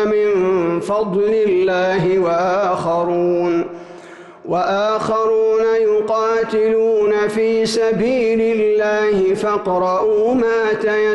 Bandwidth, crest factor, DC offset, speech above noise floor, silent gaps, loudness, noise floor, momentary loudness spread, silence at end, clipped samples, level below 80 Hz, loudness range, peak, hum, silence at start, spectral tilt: 11.5 kHz; 6 dB; under 0.1%; 22 dB; none; -16 LUFS; -38 dBFS; 3 LU; 0 s; under 0.1%; -52 dBFS; 2 LU; -10 dBFS; none; 0 s; -6 dB/octave